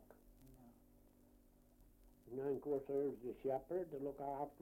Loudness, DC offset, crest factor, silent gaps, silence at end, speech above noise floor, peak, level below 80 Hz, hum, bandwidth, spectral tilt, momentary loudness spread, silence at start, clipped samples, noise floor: -44 LUFS; under 0.1%; 16 dB; none; 0.05 s; 26 dB; -30 dBFS; -70 dBFS; none; 16.5 kHz; -8.5 dB/octave; 9 LU; 0 s; under 0.1%; -69 dBFS